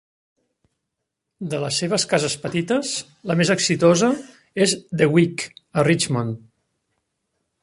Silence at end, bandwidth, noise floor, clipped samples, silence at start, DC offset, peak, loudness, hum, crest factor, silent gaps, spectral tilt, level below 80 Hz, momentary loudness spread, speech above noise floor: 1.25 s; 11.5 kHz; -80 dBFS; under 0.1%; 1.4 s; under 0.1%; -2 dBFS; -20 LUFS; none; 20 dB; none; -4.5 dB/octave; -60 dBFS; 12 LU; 60 dB